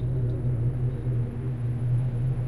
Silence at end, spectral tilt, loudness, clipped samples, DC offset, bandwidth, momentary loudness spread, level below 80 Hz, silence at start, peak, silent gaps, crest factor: 0 s; -10.5 dB/octave; -28 LUFS; under 0.1%; under 0.1%; 3.1 kHz; 3 LU; -38 dBFS; 0 s; -16 dBFS; none; 10 dB